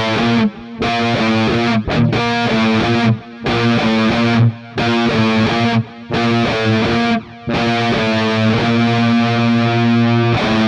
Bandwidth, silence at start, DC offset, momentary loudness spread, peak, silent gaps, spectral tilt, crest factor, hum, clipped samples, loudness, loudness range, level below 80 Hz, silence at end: 9.4 kHz; 0 s; under 0.1%; 5 LU; -4 dBFS; none; -6.5 dB/octave; 12 dB; none; under 0.1%; -15 LUFS; 1 LU; -40 dBFS; 0 s